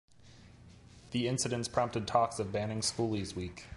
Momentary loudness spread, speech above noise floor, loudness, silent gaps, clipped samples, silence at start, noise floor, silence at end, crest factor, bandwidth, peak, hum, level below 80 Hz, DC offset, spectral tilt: 7 LU; 24 dB; -33 LUFS; none; under 0.1%; 0.2 s; -57 dBFS; 0 s; 20 dB; 11.5 kHz; -14 dBFS; none; -56 dBFS; under 0.1%; -4.5 dB/octave